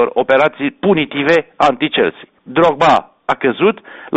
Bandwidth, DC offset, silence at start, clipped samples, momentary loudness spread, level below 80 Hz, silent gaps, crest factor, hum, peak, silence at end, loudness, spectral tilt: 8.4 kHz; under 0.1%; 0 s; under 0.1%; 6 LU; -50 dBFS; none; 14 dB; none; 0 dBFS; 0 s; -14 LUFS; -6 dB/octave